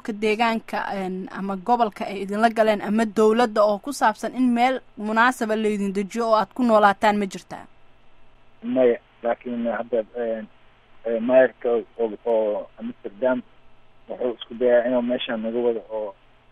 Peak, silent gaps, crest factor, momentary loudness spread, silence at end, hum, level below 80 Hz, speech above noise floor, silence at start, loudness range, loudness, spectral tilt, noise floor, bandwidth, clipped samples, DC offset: -4 dBFS; none; 20 dB; 12 LU; 0.4 s; none; -58 dBFS; 26 dB; 0.05 s; 5 LU; -22 LUFS; -5.5 dB/octave; -48 dBFS; 13.5 kHz; under 0.1%; under 0.1%